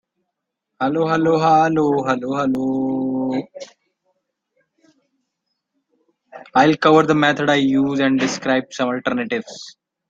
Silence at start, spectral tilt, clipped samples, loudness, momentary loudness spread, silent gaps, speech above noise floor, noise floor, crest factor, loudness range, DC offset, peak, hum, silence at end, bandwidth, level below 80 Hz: 0.8 s; -5.5 dB/octave; under 0.1%; -18 LUFS; 12 LU; none; 61 dB; -79 dBFS; 18 dB; 11 LU; under 0.1%; -2 dBFS; none; 0.4 s; 7.6 kHz; -60 dBFS